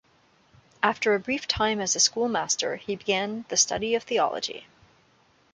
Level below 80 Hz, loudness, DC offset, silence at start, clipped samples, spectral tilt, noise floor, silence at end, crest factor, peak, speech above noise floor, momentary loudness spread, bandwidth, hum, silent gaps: -56 dBFS; -25 LUFS; under 0.1%; 0.8 s; under 0.1%; -1.5 dB/octave; -62 dBFS; 0.9 s; 22 dB; -6 dBFS; 36 dB; 8 LU; 10.5 kHz; none; none